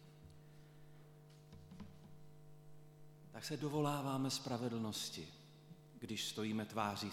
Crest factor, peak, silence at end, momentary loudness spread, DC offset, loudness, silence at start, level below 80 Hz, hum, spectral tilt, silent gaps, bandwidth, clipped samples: 22 dB; -22 dBFS; 0 s; 23 LU; under 0.1%; -42 LUFS; 0 s; -74 dBFS; none; -4.5 dB/octave; none; 17 kHz; under 0.1%